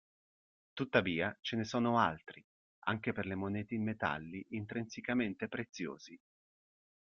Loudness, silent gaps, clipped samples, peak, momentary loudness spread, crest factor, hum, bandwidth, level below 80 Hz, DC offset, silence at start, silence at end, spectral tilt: -37 LUFS; 2.44-2.82 s; under 0.1%; -14 dBFS; 12 LU; 24 dB; none; 7.2 kHz; -72 dBFS; under 0.1%; 0.75 s; 1 s; -6 dB/octave